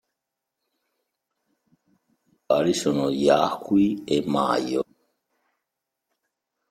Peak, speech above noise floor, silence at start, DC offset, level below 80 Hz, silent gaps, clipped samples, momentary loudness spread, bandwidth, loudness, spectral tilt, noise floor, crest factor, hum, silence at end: -4 dBFS; 62 dB; 2.5 s; under 0.1%; -64 dBFS; none; under 0.1%; 7 LU; 15 kHz; -23 LUFS; -5.5 dB/octave; -84 dBFS; 22 dB; none; 1.9 s